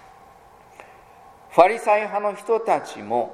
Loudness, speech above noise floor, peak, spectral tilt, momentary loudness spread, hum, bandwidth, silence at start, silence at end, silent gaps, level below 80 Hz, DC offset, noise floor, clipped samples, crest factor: -21 LUFS; 29 dB; 0 dBFS; -4.5 dB/octave; 9 LU; none; 13.5 kHz; 0.8 s; 0 s; none; -64 dBFS; under 0.1%; -49 dBFS; under 0.1%; 22 dB